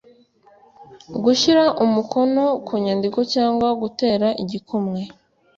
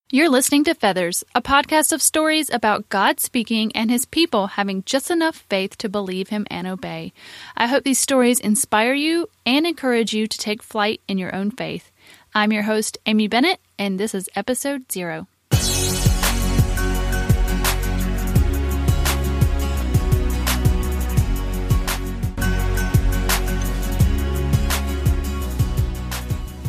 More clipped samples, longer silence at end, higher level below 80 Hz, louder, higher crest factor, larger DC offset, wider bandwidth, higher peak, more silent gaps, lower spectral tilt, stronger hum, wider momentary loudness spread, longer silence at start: neither; first, 0.45 s vs 0 s; second, -58 dBFS vs -26 dBFS; about the same, -19 LUFS vs -20 LUFS; about the same, 16 dB vs 18 dB; neither; second, 7.8 kHz vs 15.5 kHz; about the same, -4 dBFS vs -2 dBFS; neither; about the same, -5 dB/octave vs -4.5 dB/octave; neither; about the same, 11 LU vs 9 LU; first, 0.8 s vs 0.1 s